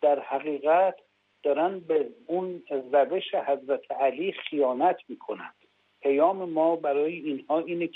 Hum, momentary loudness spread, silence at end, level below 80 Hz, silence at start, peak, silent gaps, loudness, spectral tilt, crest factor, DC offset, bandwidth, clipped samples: none; 10 LU; 0.05 s; -82 dBFS; 0 s; -10 dBFS; none; -27 LUFS; -8 dB/octave; 16 dB; under 0.1%; 4.1 kHz; under 0.1%